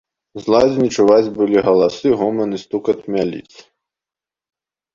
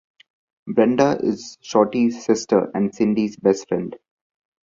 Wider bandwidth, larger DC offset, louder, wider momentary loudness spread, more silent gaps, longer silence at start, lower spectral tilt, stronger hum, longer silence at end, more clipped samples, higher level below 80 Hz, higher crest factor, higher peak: about the same, 7.6 kHz vs 7.6 kHz; neither; first, -16 LUFS vs -20 LUFS; about the same, 10 LU vs 9 LU; neither; second, 0.35 s vs 0.65 s; about the same, -6 dB/octave vs -6 dB/octave; neither; first, 1.55 s vs 0.7 s; neither; first, -52 dBFS vs -62 dBFS; about the same, 16 dB vs 18 dB; about the same, -2 dBFS vs -2 dBFS